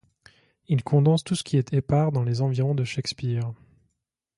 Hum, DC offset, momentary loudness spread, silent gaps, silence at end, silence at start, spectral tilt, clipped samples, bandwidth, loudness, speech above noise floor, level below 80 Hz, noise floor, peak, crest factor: none; under 0.1%; 8 LU; none; 0.85 s; 0.7 s; -7 dB/octave; under 0.1%; 11.5 kHz; -24 LUFS; 57 dB; -56 dBFS; -80 dBFS; -8 dBFS; 16 dB